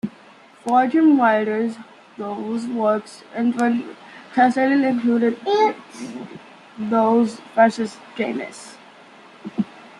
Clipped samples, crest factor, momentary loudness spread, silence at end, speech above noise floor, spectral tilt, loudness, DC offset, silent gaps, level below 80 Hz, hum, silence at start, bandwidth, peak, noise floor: under 0.1%; 18 dB; 18 LU; 0.2 s; 28 dB; -6 dB/octave; -20 LUFS; under 0.1%; none; -70 dBFS; none; 0.05 s; 11 kHz; -2 dBFS; -48 dBFS